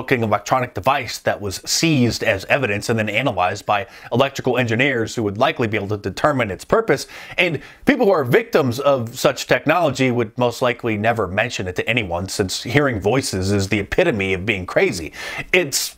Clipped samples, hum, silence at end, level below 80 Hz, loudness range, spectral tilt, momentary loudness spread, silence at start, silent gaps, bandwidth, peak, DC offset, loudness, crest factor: under 0.1%; none; 0.05 s; -46 dBFS; 2 LU; -4.5 dB/octave; 5 LU; 0 s; none; 16 kHz; 0 dBFS; under 0.1%; -19 LUFS; 20 dB